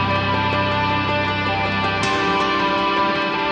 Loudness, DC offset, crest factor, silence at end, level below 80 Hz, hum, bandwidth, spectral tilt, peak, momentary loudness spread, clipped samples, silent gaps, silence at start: -19 LUFS; under 0.1%; 12 dB; 0 s; -44 dBFS; none; 10 kHz; -5 dB/octave; -6 dBFS; 2 LU; under 0.1%; none; 0 s